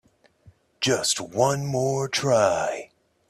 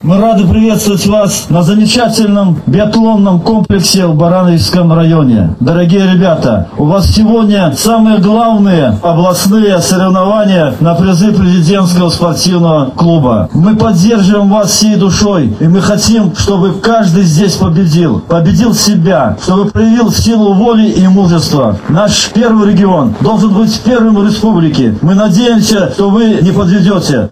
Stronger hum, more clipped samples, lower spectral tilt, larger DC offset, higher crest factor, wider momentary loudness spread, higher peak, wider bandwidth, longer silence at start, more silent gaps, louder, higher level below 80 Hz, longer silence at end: neither; second, under 0.1% vs 0.1%; second, -3.5 dB/octave vs -6 dB/octave; neither; first, 18 dB vs 6 dB; first, 7 LU vs 3 LU; second, -6 dBFS vs 0 dBFS; about the same, 14 kHz vs 15 kHz; first, 0.8 s vs 0 s; neither; second, -23 LUFS vs -8 LUFS; second, -62 dBFS vs -30 dBFS; first, 0.45 s vs 0 s